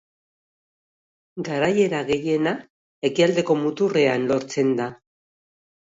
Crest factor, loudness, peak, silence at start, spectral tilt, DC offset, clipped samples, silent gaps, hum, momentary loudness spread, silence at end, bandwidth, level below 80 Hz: 18 dB; -22 LUFS; -6 dBFS; 1.35 s; -5.5 dB/octave; under 0.1%; under 0.1%; 2.70-3.02 s; none; 10 LU; 1 s; 7.8 kHz; -64 dBFS